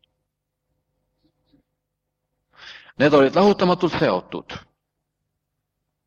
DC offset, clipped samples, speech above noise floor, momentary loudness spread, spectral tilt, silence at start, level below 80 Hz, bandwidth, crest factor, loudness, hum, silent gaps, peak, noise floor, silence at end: under 0.1%; under 0.1%; 61 dB; 23 LU; -6.5 dB/octave; 2.65 s; -58 dBFS; 7.4 kHz; 22 dB; -18 LUFS; 50 Hz at -55 dBFS; none; -2 dBFS; -79 dBFS; 1.5 s